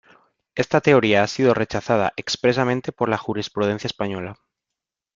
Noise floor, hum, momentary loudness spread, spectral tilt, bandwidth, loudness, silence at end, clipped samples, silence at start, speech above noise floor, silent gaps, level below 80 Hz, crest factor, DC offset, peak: -85 dBFS; none; 11 LU; -5.5 dB/octave; 7.6 kHz; -21 LUFS; 0.8 s; under 0.1%; 0.55 s; 65 dB; none; -56 dBFS; 20 dB; under 0.1%; -2 dBFS